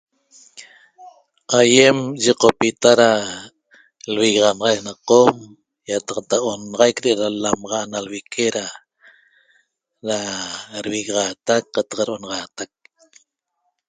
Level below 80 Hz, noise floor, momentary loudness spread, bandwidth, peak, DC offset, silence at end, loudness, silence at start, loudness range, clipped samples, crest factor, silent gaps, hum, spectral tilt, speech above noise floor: -60 dBFS; -73 dBFS; 15 LU; 9.6 kHz; 0 dBFS; under 0.1%; 1.25 s; -18 LUFS; 0.55 s; 9 LU; under 0.1%; 20 dB; none; none; -3 dB/octave; 55 dB